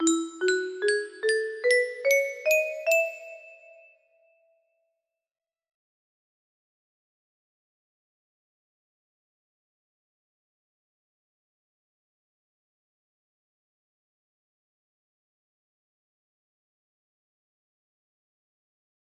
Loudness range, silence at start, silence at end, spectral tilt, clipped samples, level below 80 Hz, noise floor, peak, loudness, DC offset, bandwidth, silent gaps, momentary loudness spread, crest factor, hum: 8 LU; 0 s; 15.45 s; -0.5 dB/octave; under 0.1%; -82 dBFS; -83 dBFS; -10 dBFS; -25 LUFS; under 0.1%; 13.5 kHz; none; 7 LU; 22 dB; none